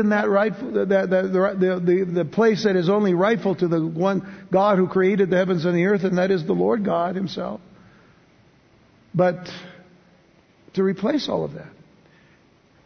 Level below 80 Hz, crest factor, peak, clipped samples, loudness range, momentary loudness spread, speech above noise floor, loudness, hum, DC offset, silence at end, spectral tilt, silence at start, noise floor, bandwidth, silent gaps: -62 dBFS; 16 dB; -6 dBFS; under 0.1%; 8 LU; 10 LU; 36 dB; -21 LUFS; none; under 0.1%; 1.15 s; -7.5 dB/octave; 0 s; -56 dBFS; 6.6 kHz; none